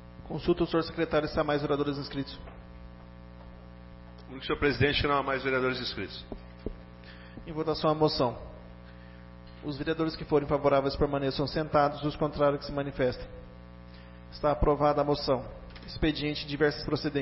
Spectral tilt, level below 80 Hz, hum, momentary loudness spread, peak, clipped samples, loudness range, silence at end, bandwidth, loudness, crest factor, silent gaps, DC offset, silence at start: -9.5 dB/octave; -44 dBFS; 60 Hz at -50 dBFS; 23 LU; -12 dBFS; under 0.1%; 5 LU; 0 s; 6 kHz; -29 LUFS; 18 dB; none; under 0.1%; 0 s